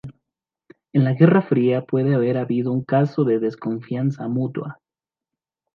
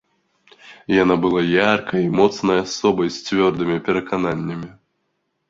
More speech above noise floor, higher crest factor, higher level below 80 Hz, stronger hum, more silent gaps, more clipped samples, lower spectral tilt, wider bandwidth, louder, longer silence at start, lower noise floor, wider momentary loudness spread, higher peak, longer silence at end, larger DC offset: first, over 71 dB vs 53 dB; about the same, 20 dB vs 18 dB; second, -66 dBFS vs -52 dBFS; neither; neither; neither; first, -10.5 dB/octave vs -5.5 dB/octave; second, 5.8 kHz vs 7.8 kHz; about the same, -20 LUFS vs -19 LUFS; second, 0.05 s vs 0.65 s; first, under -90 dBFS vs -72 dBFS; about the same, 11 LU vs 9 LU; about the same, -2 dBFS vs -2 dBFS; first, 1 s vs 0.8 s; neither